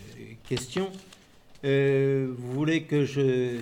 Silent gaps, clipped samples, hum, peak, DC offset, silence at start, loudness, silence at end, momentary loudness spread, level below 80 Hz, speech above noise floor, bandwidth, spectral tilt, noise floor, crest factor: none; under 0.1%; none; -14 dBFS; under 0.1%; 0 s; -27 LUFS; 0 s; 13 LU; -60 dBFS; 27 dB; 15.5 kHz; -6.5 dB/octave; -53 dBFS; 14 dB